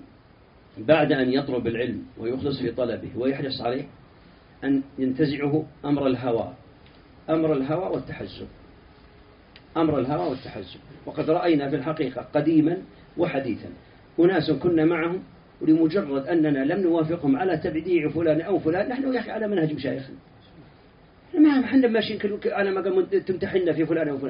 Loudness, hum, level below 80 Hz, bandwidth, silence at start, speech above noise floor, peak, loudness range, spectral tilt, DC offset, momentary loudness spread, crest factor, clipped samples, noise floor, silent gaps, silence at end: -24 LUFS; none; -56 dBFS; 5.4 kHz; 0.75 s; 29 dB; -6 dBFS; 6 LU; -5.5 dB/octave; under 0.1%; 13 LU; 18 dB; under 0.1%; -53 dBFS; none; 0 s